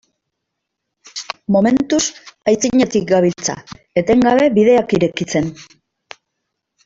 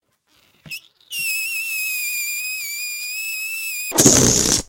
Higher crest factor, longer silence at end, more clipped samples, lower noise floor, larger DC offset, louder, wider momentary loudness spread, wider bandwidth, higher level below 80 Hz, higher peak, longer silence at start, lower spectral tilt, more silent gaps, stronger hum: second, 16 dB vs 22 dB; first, 1.25 s vs 0.05 s; neither; first, -77 dBFS vs -60 dBFS; neither; first, -15 LUFS vs -18 LUFS; second, 14 LU vs 18 LU; second, 8 kHz vs 16.5 kHz; second, -50 dBFS vs -44 dBFS; about the same, -2 dBFS vs 0 dBFS; first, 1.15 s vs 0.65 s; first, -5 dB/octave vs -2 dB/octave; neither; neither